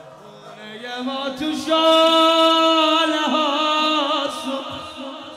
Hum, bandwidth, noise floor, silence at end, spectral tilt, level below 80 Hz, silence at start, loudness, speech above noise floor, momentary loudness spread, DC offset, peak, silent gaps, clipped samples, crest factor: none; 16 kHz; -41 dBFS; 0 s; -2.5 dB/octave; -64 dBFS; 0 s; -17 LUFS; 24 dB; 18 LU; under 0.1%; -6 dBFS; none; under 0.1%; 14 dB